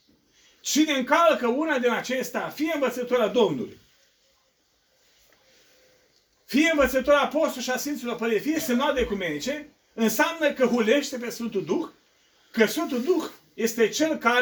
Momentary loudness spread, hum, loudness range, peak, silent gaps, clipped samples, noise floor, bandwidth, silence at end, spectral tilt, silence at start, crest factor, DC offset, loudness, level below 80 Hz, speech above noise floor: 10 LU; none; 5 LU; -4 dBFS; none; under 0.1%; -67 dBFS; over 20 kHz; 0 s; -3.5 dB/octave; 0.65 s; 20 dB; under 0.1%; -24 LUFS; -54 dBFS; 44 dB